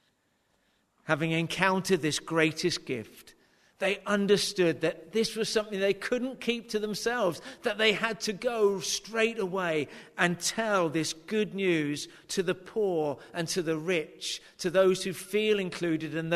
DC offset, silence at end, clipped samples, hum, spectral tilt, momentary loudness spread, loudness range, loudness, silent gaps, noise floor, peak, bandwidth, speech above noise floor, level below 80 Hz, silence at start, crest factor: under 0.1%; 0 s; under 0.1%; none; -4 dB/octave; 8 LU; 2 LU; -29 LUFS; none; -72 dBFS; -8 dBFS; 13.5 kHz; 43 dB; -66 dBFS; 1.05 s; 22 dB